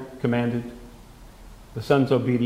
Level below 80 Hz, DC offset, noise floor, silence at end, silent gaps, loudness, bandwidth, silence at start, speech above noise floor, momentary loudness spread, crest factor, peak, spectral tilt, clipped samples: -48 dBFS; under 0.1%; -45 dBFS; 0 s; none; -23 LUFS; 15.5 kHz; 0 s; 23 dB; 19 LU; 20 dB; -6 dBFS; -8 dB/octave; under 0.1%